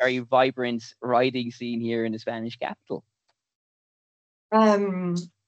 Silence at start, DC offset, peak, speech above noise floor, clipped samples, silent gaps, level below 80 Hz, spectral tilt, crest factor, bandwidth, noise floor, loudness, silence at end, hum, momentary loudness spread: 0 s; under 0.1%; -6 dBFS; over 65 dB; under 0.1%; 3.55-4.49 s; -76 dBFS; -6 dB/octave; 20 dB; 8.4 kHz; under -90 dBFS; -25 LUFS; 0.2 s; none; 12 LU